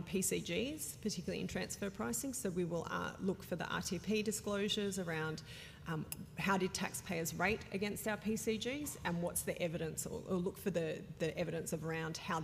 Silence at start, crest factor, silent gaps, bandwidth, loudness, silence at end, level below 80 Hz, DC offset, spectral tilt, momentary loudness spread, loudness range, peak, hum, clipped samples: 0 s; 18 dB; none; 15.5 kHz; -39 LUFS; 0 s; -64 dBFS; under 0.1%; -4 dB/octave; 6 LU; 2 LU; -22 dBFS; none; under 0.1%